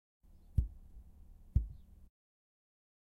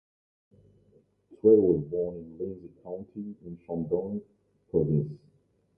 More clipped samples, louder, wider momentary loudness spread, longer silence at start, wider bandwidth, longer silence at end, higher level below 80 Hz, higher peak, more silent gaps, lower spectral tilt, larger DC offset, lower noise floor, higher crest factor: neither; second, -40 LUFS vs -28 LUFS; about the same, 22 LU vs 20 LU; second, 0.55 s vs 1.3 s; second, 1 kHz vs 1.3 kHz; first, 1.3 s vs 0.6 s; first, -44 dBFS vs -58 dBFS; second, -18 dBFS vs -8 dBFS; neither; second, -10.5 dB/octave vs -14.5 dB/octave; neither; second, -57 dBFS vs -64 dBFS; about the same, 24 dB vs 20 dB